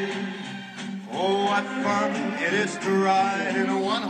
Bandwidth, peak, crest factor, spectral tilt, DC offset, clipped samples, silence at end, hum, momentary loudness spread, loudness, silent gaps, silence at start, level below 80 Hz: 10 kHz; -10 dBFS; 14 dB; -4.5 dB/octave; under 0.1%; under 0.1%; 0 s; none; 13 LU; -25 LUFS; none; 0 s; -78 dBFS